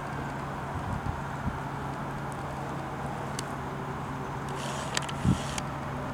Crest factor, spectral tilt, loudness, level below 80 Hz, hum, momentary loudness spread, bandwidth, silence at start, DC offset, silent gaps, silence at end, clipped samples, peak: 26 dB; -5 dB/octave; -34 LUFS; -48 dBFS; none; 6 LU; 17 kHz; 0 s; under 0.1%; none; 0 s; under 0.1%; -8 dBFS